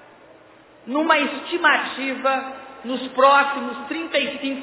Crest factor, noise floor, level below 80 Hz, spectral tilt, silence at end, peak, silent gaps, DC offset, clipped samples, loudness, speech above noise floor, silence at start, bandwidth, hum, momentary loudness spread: 18 dB; -49 dBFS; -68 dBFS; -6.5 dB/octave; 0 s; -2 dBFS; none; under 0.1%; under 0.1%; -20 LUFS; 28 dB; 0.85 s; 4 kHz; none; 13 LU